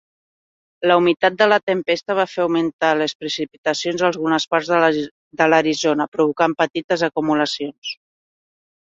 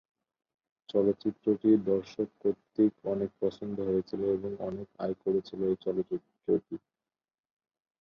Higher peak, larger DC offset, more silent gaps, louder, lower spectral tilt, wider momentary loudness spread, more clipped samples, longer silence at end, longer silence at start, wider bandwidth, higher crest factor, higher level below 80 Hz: first, -2 dBFS vs -12 dBFS; neither; first, 1.63-1.67 s, 2.73-2.79 s, 3.15-3.20 s, 3.58-3.64 s, 5.11-5.31 s, 6.08-6.12 s, 6.84-6.89 s, 7.78-7.82 s vs none; first, -19 LUFS vs -31 LUFS; second, -4.5 dB/octave vs -9 dB/octave; about the same, 9 LU vs 10 LU; neither; second, 0.95 s vs 1.25 s; second, 0.8 s vs 0.95 s; first, 7.8 kHz vs 6.6 kHz; about the same, 18 dB vs 18 dB; about the same, -64 dBFS vs -66 dBFS